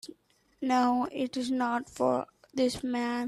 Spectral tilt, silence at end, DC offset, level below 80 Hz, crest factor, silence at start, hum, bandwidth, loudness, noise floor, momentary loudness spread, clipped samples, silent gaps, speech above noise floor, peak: -4.5 dB/octave; 0 s; under 0.1%; -64 dBFS; 16 dB; 0.05 s; none; 12.5 kHz; -30 LUFS; -61 dBFS; 9 LU; under 0.1%; none; 32 dB; -14 dBFS